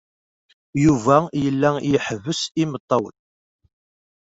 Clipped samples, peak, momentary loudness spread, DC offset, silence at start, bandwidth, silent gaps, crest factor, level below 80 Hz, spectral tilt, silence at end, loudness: under 0.1%; -2 dBFS; 8 LU; under 0.1%; 0.75 s; 8 kHz; 2.80-2.88 s; 20 dB; -52 dBFS; -6 dB/octave; 1.1 s; -20 LUFS